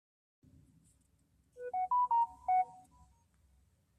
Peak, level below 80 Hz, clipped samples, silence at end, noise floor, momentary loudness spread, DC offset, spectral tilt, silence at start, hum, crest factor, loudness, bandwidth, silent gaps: -24 dBFS; -72 dBFS; under 0.1%; 1.2 s; -73 dBFS; 11 LU; under 0.1%; -5 dB/octave; 1.55 s; none; 14 dB; -34 LUFS; 9.8 kHz; none